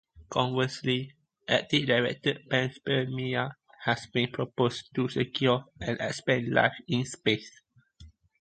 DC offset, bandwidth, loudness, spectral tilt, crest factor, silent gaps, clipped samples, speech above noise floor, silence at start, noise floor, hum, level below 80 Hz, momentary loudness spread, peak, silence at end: under 0.1%; 9.2 kHz; -29 LUFS; -5.5 dB/octave; 22 dB; none; under 0.1%; 26 dB; 0.15 s; -54 dBFS; none; -60 dBFS; 7 LU; -6 dBFS; 0.3 s